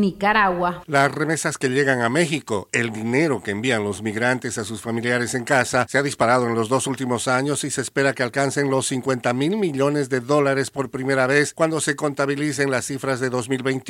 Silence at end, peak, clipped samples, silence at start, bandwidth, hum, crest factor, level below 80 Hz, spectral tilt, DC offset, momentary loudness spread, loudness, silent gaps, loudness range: 0 s; -2 dBFS; under 0.1%; 0 s; 16.5 kHz; none; 18 dB; -58 dBFS; -4.5 dB/octave; under 0.1%; 5 LU; -21 LUFS; none; 1 LU